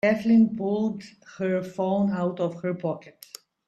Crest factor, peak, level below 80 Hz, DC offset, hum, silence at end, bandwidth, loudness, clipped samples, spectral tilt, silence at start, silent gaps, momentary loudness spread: 14 dB; -10 dBFS; -66 dBFS; under 0.1%; none; 0.55 s; 12.5 kHz; -25 LUFS; under 0.1%; -7.5 dB/octave; 0.05 s; none; 22 LU